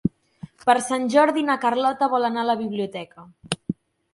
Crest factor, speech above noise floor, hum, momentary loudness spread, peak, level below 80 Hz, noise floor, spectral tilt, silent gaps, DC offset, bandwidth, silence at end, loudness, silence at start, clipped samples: 20 dB; 23 dB; none; 14 LU; -4 dBFS; -58 dBFS; -44 dBFS; -4.5 dB/octave; none; under 0.1%; 11.5 kHz; 0.4 s; -22 LUFS; 0.05 s; under 0.1%